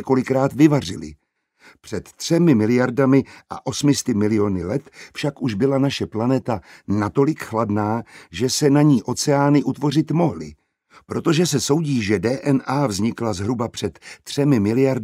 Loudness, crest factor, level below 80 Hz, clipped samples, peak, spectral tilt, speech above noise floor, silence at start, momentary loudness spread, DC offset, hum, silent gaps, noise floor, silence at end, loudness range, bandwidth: -20 LUFS; 18 dB; -54 dBFS; under 0.1%; -2 dBFS; -6 dB/octave; 33 dB; 0 s; 13 LU; under 0.1%; none; none; -52 dBFS; 0 s; 3 LU; 15.5 kHz